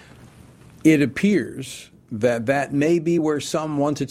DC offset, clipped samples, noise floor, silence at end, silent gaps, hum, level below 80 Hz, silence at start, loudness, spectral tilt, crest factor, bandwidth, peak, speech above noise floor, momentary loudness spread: under 0.1%; under 0.1%; -47 dBFS; 0.05 s; none; none; -56 dBFS; 0.25 s; -21 LUFS; -6 dB/octave; 18 dB; 15 kHz; -4 dBFS; 26 dB; 15 LU